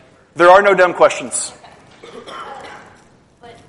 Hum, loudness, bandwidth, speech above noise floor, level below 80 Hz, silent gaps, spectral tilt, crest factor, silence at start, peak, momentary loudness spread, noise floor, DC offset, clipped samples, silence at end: none; -12 LUFS; 11.5 kHz; 37 dB; -54 dBFS; none; -3 dB/octave; 16 dB; 0.35 s; 0 dBFS; 24 LU; -49 dBFS; under 0.1%; under 0.1%; 0.95 s